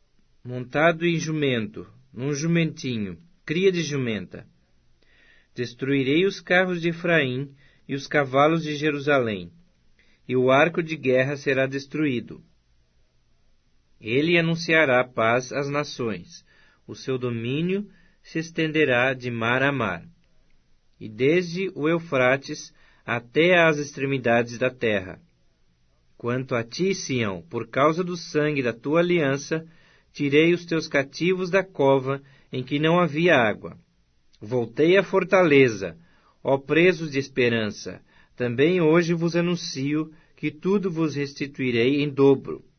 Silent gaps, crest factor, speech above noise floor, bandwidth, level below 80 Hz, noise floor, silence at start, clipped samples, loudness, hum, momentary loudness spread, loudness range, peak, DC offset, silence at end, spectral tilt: none; 18 dB; 40 dB; 6.6 kHz; -60 dBFS; -63 dBFS; 0.45 s; under 0.1%; -23 LUFS; none; 14 LU; 5 LU; -6 dBFS; under 0.1%; 0.2 s; -6 dB/octave